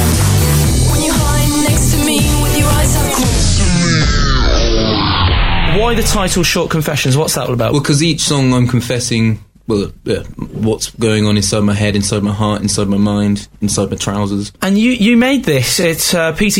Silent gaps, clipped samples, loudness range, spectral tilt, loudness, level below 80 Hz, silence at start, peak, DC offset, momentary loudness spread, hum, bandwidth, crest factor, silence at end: none; under 0.1%; 3 LU; -4.5 dB/octave; -13 LUFS; -20 dBFS; 0 s; -2 dBFS; under 0.1%; 6 LU; none; 16.5 kHz; 12 dB; 0 s